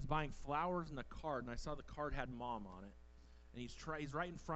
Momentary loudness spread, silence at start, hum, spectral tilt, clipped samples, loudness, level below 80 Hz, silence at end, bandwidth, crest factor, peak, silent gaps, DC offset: 16 LU; 0 s; none; -6 dB/octave; under 0.1%; -45 LUFS; -54 dBFS; 0 s; 8.2 kHz; 20 dB; -24 dBFS; none; under 0.1%